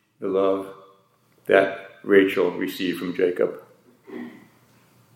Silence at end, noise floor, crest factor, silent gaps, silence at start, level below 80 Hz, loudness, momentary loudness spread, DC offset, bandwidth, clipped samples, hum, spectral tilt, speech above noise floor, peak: 0.8 s; -61 dBFS; 22 dB; none; 0.2 s; -76 dBFS; -22 LUFS; 20 LU; under 0.1%; 16.5 kHz; under 0.1%; none; -6 dB/octave; 39 dB; -2 dBFS